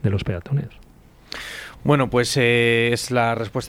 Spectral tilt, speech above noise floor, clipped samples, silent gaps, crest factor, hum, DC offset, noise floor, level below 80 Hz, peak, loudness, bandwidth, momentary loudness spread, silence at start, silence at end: -5 dB/octave; 22 dB; under 0.1%; none; 16 dB; none; under 0.1%; -42 dBFS; -46 dBFS; -4 dBFS; -20 LUFS; 16.5 kHz; 17 LU; 0.05 s; 0 s